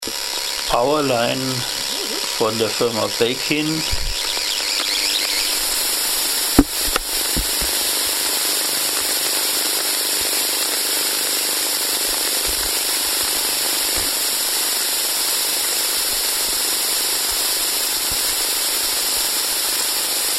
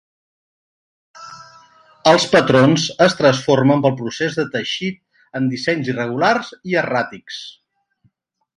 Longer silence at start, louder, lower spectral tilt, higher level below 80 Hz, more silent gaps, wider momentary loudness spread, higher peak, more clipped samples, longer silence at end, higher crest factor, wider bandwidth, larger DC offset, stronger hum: second, 0 s vs 1.15 s; about the same, -17 LUFS vs -17 LUFS; second, -1 dB/octave vs -5 dB/octave; first, -38 dBFS vs -58 dBFS; neither; second, 3 LU vs 18 LU; about the same, 0 dBFS vs 0 dBFS; neither; second, 0 s vs 1.05 s; about the same, 20 dB vs 18 dB; first, 16.5 kHz vs 11 kHz; neither; neither